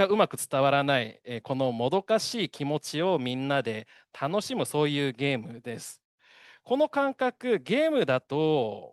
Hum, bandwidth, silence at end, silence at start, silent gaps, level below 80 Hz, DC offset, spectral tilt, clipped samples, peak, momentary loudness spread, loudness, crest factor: none; 12.5 kHz; 0.05 s; 0 s; 6.05-6.18 s; -74 dBFS; under 0.1%; -5 dB/octave; under 0.1%; -8 dBFS; 11 LU; -27 LUFS; 20 dB